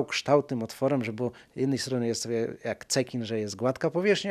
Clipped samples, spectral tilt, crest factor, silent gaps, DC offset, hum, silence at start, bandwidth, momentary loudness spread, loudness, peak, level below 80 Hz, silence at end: under 0.1%; -4.5 dB/octave; 20 dB; none; under 0.1%; none; 0 s; 14.5 kHz; 8 LU; -29 LUFS; -8 dBFS; -70 dBFS; 0 s